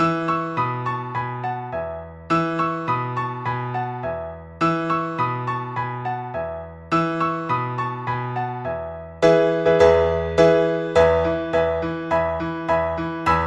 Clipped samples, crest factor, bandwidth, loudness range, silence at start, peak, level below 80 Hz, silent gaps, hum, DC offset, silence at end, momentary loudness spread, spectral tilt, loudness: under 0.1%; 20 dB; 9.4 kHz; 7 LU; 0 s; -2 dBFS; -44 dBFS; none; none; under 0.1%; 0 s; 12 LU; -7 dB/octave; -22 LUFS